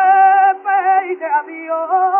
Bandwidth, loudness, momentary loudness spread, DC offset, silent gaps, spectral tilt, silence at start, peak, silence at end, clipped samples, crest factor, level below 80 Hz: 3.2 kHz; -14 LUFS; 10 LU; under 0.1%; none; -6 dB/octave; 0 s; -2 dBFS; 0 s; under 0.1%; 12 dB; -84 dBFS